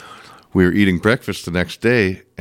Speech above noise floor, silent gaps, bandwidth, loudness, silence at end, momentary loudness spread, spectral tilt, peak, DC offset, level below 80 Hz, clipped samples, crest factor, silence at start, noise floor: 25 dB; none; 16.5 kHz; -17 LUFS; 0.2 s; 8 LU; -6.5 dB/octave; -2 dBFS; under 0.1%; -44 dBFS; under 0.1%; 16 dB; 0 s; -41 dBFS